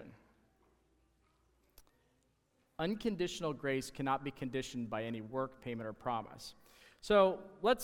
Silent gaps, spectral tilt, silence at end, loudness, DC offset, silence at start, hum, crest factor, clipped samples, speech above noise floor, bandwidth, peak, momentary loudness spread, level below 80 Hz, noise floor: none; -5 dB/octave; 0 s; -37 LUFS; under 0.1%; 0 s; none; 22 dB; under 0.1%; 40 dB; 17 kHz; -16 dBFS; 14 LU; -64 dBFS; -76 dBFS